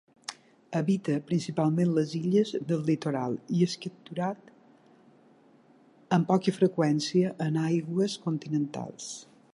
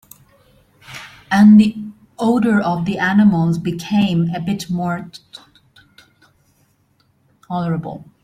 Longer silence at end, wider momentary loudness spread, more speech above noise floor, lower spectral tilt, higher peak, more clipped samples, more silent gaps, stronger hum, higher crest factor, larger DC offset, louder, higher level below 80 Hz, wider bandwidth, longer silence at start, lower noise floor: about the same, 0.3 s vs 0.2 s; second, 13 LU vs 24 LU; second, 32 dB vs 45 dB; about the same, -6.5 dB/octave vs -7 dB/octave; second, -10 dBFS vs -2 dBFS; neither; neither; neither; about the same, 18 dB vs 16 dB; neither; second, -28 LUFS vs -16 LUFS; second, -74 dBFS vs -54 dBFS; about the same, 11.5 kHz vs 12.5 kHz; second, 0.3 s vs 0.9 s; about the same, -59 dBFS vs -60 dBFS